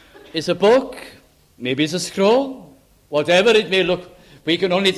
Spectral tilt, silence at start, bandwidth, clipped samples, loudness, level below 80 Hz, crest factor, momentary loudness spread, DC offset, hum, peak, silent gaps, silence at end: -4.5 dB/octave; 0.35 s; 14.5 kHz; under 0.1%; -18 LUFS; -56 dBFS; 16 dB; 14 LU; under 0.1%; none; -2 dBFS; none; 0 s